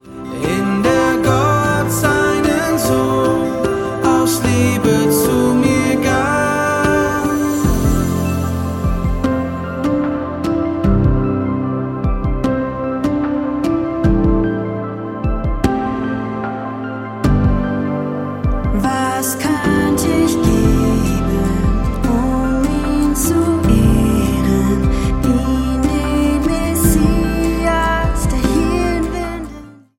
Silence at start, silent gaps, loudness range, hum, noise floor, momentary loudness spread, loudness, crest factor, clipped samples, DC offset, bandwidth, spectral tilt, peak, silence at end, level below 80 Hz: 0.05 s; none; 4 LU; none; -35 dBFS; 7 LU; -16 LUFS; 14 dB; under 0.1%; under 0.1%; 17 kHz; -6 dB/octave; 0 dBFS; 0.25 s; -24 dBFS